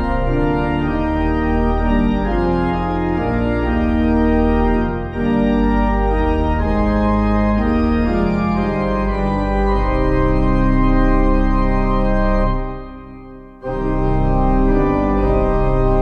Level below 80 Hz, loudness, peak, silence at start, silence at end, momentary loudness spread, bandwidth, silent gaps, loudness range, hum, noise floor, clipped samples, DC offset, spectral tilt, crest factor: -20 dBFS; -17 LUFS; -4 dBFS; 0 s; 0 s; 4 LU; 5.2 kHz; none; 2 LU; none; -36 dBFS; under 0.1%; under 0.1%; -9 dB/octave; 12 dB